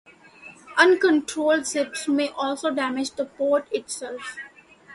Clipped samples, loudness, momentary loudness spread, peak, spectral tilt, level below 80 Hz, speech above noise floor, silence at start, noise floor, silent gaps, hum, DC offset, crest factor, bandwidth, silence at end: under 0.1%; -23 LUFS; 16 LU; -2 dBFS; -2 dB/octave; -70 dBFS; 24 dB; 0.45 s; -47 dBFS; none; none; under 0.1%; 22 dB; 11.5 kHz; 0 s